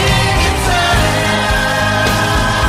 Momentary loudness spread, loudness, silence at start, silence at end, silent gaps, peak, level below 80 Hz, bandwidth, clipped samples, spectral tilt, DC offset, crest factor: 1 LU; -13 LUFS; 0 s; 0 s; none; -2 dBFS; -22 dBFS; 16 kHz; under 0.1%; -4 dB/octave; under 0.1%; 12 dB